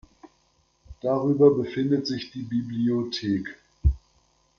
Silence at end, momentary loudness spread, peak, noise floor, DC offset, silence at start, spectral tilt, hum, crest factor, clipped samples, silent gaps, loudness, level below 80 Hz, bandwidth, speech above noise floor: 0.6 s; 13 LU; -6 dBFS; -66 dBFS; under 0.1%; 0.25 s; -7.5 dB/octave; none; 20 dB; under 0.1%; none; -25 LUFS; -36 dBFS; 7.2 kHz; 42 dB